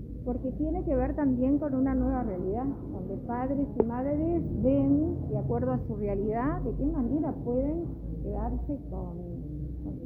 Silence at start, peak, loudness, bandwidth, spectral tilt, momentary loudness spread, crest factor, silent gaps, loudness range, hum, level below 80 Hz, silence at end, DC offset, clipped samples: 0 s; -8 dBFS; -30 LUFS; 3 kHz; -12.5 dB/octave; 10 LU; 22 dB; none; 3 LU; none; -38 dBFS; 0 s; under 0.1%; under 0.1%